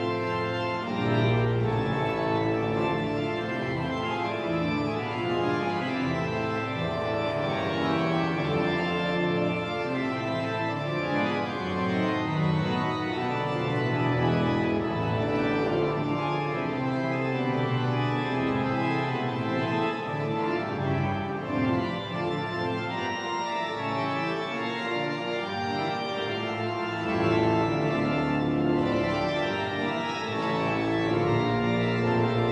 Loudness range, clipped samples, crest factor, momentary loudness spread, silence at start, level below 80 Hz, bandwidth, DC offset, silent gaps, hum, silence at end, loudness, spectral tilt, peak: 3 LU; under 0.1%; 14 dB; 4 LU; 0 s; -56 dBFS; 9.4 kHz; under 0.1%; none; none; 0 s; -27 LUFS; -7 dB/octave; -12 dBFS